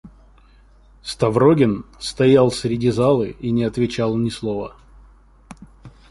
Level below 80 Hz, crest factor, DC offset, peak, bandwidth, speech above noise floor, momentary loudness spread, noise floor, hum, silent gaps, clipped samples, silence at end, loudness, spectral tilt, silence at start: -46 dBFS; 18 dB; under 0.1%; -2 dBFS; 11.5 kHz; 32 dB; 14 LU; -50 dBFS; none; none; under 0.1%; 0.2 s; -19 LUFS; -6.5 dB/octave; 0.05 s